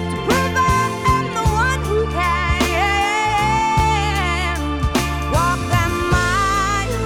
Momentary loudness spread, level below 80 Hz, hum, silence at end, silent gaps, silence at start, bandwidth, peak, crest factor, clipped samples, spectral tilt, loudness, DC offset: 3 LU; -26 dBFS; none; 0 s; none; 0 s; 19.5 kHz; -4 dBFS; 14 dB; under 0.1%; -4.5 dB/octave; -18 LUFS; under 0.1%